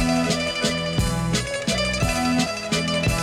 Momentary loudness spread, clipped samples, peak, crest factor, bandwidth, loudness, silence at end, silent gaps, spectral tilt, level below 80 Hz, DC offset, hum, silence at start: 2 LU; under 0.1%; -8 dBFS; 14 dB; 17.5 kHz; -22 LUFS; 0 s; none; -4 dB/octave; -34 dBFS; under 0.1%; none; 0 s